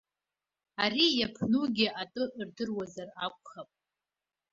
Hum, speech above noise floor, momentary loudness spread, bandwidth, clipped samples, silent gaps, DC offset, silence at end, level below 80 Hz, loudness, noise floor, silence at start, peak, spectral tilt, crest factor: 50 Hz at -60 dBFS; over 58 dB; 19 LU; 7.6 kHz; under 0.1%; none; under 0.1%; 0.9 s; -68 dBFS; -30 LUFS; under -90 dBFS; 0.8 s; -12 dBFS; -4.5 dB/octave; 20 dB